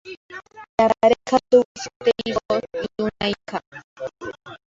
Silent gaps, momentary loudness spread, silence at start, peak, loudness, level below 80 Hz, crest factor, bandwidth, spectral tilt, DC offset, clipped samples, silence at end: 0.17-0.29 s, 0.69-0.78 s, 1.65-1.75 s, 1.96-2.00 s, 2.45-2.49 s, 3.67-3.72 s, 3.84-3.96 s; 19 LU; 0.05 s; -4 dBFS; -21 LUFS; -54 dBFS; 20 dB; 7.8 kHz; -4.5 dB/octave; under 0.1%; under 0.1%; 0.1 s